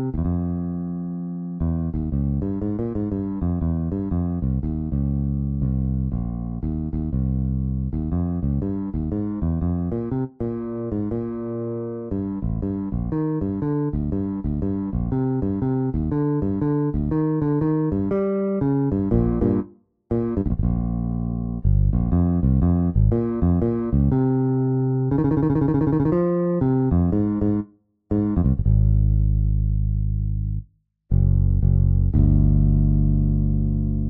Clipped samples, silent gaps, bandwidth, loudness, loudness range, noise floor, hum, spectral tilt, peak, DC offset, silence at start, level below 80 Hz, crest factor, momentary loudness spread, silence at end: under 0.1%; none; 2.5 kHz; -23 LUFS; 5 LU; -50 dBFS; none; -14 dB/octave; -6 dBFS; under 0.1%; 0 s; -28 dBFS; 14 dB; 8 LU; 0 s